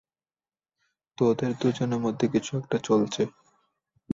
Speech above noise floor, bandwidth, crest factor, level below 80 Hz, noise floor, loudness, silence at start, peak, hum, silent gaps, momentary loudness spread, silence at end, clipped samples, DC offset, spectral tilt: over 64 dB; 7.8 kHz; 16 dB; -64 dBFS; under -90 dBFS; -27 LUFS; 1.2 s; -12 dBFS; none; none; 5 LU; 0 s; under 0.1%; under 0.1%; -6.5 dB/octave